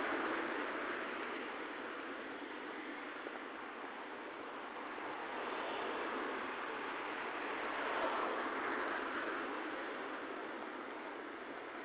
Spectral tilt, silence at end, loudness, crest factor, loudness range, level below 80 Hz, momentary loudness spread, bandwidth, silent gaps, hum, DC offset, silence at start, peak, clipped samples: -0.5 dB/octave; 0 s; -42 LUFS; 16 dB; 6 LU; -78 dBFS; 8 LU; 4 kHz; none; none; under 0.1%; 0 s; -26 dBFS; under 0.1%